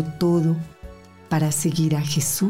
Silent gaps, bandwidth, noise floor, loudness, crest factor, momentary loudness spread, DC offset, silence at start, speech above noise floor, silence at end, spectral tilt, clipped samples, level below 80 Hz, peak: none; 16 kHz; -42 dBFS; -22 LUFS; 10 dB; 7 LU; under 0.1%; 0 s; 21 dB; 0 s; -5.5 dB/octave; under 0.1%; -50 dBFS; -12 dBFS